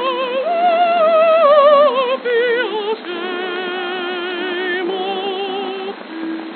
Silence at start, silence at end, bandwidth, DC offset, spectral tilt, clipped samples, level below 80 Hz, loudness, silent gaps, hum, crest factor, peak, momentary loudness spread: 0 s; 0 s; 4.5 kHz; under 0.1%; 0 dB/octave; under 0.1%; under -90 dBFS; -16 LUFS; none; none; 16 dB; 0 dBFS; 13 LU